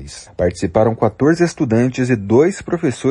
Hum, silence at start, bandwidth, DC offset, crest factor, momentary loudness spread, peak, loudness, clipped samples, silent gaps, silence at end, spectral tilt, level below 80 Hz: none; 0 s; 11 kHz; under 0.1%; 14 dB; 6 LU; -2 dBFS; -16 LUFS; under 0.1%; none; 0 s; -7 dB/octave; -42 dBFS